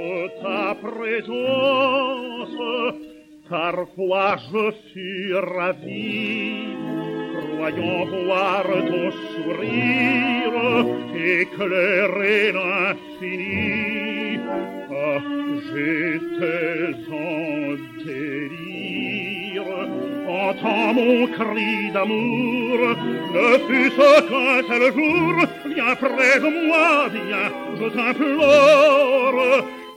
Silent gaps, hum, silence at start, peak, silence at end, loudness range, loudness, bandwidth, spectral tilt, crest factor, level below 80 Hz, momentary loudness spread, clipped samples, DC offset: none; none; 0 s; -2 dBFS; 0 s; 9 LU; -20 LUFS; 16.5 kHz; -5.5 dB/octave; 20 dB; -64 dBFS; 12 LU; under 0.1%; under 0.1%